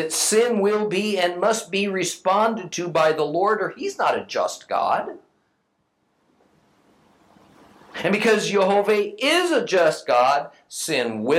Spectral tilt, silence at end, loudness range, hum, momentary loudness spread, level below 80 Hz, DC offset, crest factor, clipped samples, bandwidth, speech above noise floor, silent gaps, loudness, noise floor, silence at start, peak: -3 dB/octave; 0 s; 10 LU; none; 7 LU; -72 dBFS; under 0.1%; 16 dB; under 0.1%; 16 kHz; 49 dB; none; -21 LUFS; -70 dBFS; 0 s; -6 dBFS